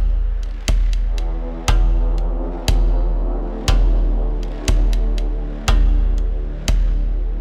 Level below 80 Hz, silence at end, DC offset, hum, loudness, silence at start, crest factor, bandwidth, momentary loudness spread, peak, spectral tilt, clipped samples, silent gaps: -16 dBFS; 0 s; under 0.1%; none; -21 LUFS; 0 s; 10 dB; 12 kHz; 6 LU; -6 dBFS; -5.5 dB/octave; under 0.1%; none